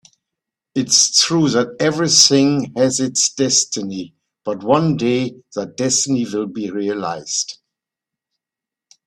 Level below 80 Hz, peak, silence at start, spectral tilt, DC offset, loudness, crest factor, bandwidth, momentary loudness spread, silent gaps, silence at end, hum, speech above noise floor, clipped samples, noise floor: -60 dBFS; 0 dBFS; 0.75 s; -3 dB/octave; under 0.1%; -16 LUFS; 18 dB; 15.5 kHz; 16 LU; none; 1.55 s; none; 70 dB; under 0.1%; -87 dBFS